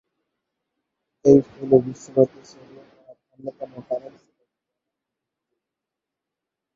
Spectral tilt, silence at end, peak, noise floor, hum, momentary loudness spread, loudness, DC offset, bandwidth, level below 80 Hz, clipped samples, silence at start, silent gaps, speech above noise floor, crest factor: -9 dB/octave; 2.8 s; -2 dBFS; -86 dBFS; none; 21 LU; -20 LUFS; under 0.1%; 7.6 kHz; -62 dBFS; under 0.1%; 1.25 s; none; 65 dB; 24 dB